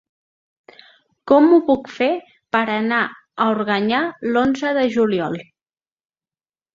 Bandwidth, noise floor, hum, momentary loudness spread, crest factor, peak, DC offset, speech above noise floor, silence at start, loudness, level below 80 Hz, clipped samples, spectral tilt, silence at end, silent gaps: 7.4 kHz; under -90 dBFS; none; 9 LU; 18 dB; -2 dBFS; under 0.1%; over 73 dB; 1.25 s; -18 LUFS; -58 dBFS; under 0.1%; -6 dB/octave; 1.3 s; none